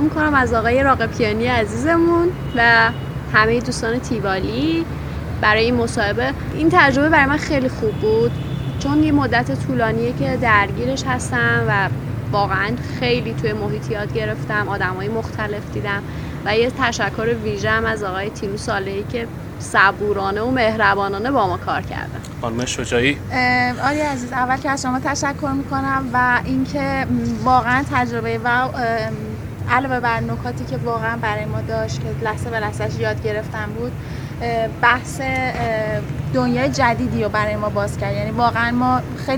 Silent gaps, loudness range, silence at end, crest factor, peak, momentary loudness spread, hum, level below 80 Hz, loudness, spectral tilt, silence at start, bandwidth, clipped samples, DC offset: none; 5 LU; 0 s; 18 dB; 0 dBFS; 9 LU; none; -36 dBFS; -19 LUFS; -5.5 dB/octave; 0 s; over 20 kHz; under 0.1%; 0.1%